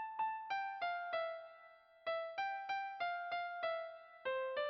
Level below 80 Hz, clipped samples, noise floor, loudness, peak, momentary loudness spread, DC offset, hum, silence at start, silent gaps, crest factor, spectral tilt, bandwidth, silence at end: -88 dBFS; under 0.1%; -63 dBFS; -42 LUFS; -30 dBFS; 10 LU; under 0.1%; none; 0 s; none; 12 dB; 2.5 dB/octave; 6 kHz; 0 s